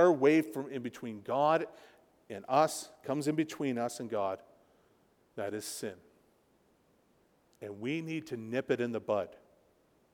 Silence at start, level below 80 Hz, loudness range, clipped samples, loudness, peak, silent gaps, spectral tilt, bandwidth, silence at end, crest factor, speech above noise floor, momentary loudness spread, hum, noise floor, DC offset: 0 s; -80 dBFS; 10 LU; under 0.1%; -33 LUFS; -14 dBFS; none; -5.5 dB/octave; 18.5 kHz; 0.75 s; 20 dB; 37 dB; 15 LU; none; -69 dBFS; under 0.1%